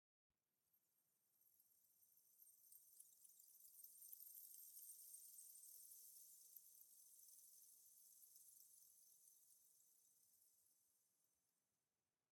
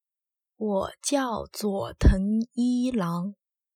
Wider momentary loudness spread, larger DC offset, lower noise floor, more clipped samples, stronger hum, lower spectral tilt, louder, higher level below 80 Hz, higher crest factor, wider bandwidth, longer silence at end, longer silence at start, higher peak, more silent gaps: about the same, 8 LU vs 8 LU; neither; about the same, under -90 dBFS vs -89 dBFS; neither; neither; second, 2 dB/octave vs -6 dB/octave; second, -63 LUFS vs -27 LUFS; second, under -90 dBFS vs -32 dBFS; about the same, 24 dB vs 20 dB; first, 19 kHz vs 16 kHz; first, 0.75 s vs 0.45 s; about the same, 0.65 s vs 0.6 s; second, -44 dBFS vs -6 dBFS; neither